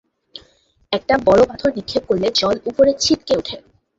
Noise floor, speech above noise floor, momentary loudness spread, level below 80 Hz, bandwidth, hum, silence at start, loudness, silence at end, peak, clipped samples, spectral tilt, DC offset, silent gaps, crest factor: -56 dBFS; 40 dB; 10 LU; -46 dBFS; 8 kHz; none; 0.35 s; -17 LUFS; 0.4 s; -2 dBFS; under 0.1%; -4 dB/octave; under 0.1%; none; 16 dB